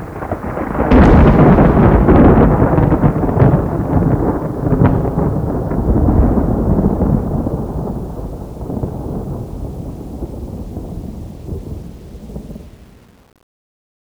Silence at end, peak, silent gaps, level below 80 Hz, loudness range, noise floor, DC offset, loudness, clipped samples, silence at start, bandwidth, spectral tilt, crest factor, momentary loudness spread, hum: 1.2 s; 0 dBFS; none; -20 dBFS; 19 LU; -44 dBFS; under 0.1%; -13 LUFS; under 0.1%; 0 s; 10.5 kHz; -10 dB/octave; 14 dB; 20 LU; none